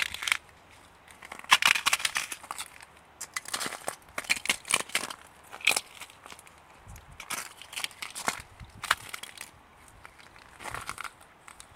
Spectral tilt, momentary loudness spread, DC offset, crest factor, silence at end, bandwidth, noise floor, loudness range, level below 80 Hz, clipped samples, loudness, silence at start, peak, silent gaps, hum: 0.5 dB/octave; 25 LU; under 0.1%; 32 dB; 0 s; 17 kHz; -55 dBFS; 8 LU; -62 dBFS; under 0.1%; -29 LUFS; 0 s; -2 dBFS; none; none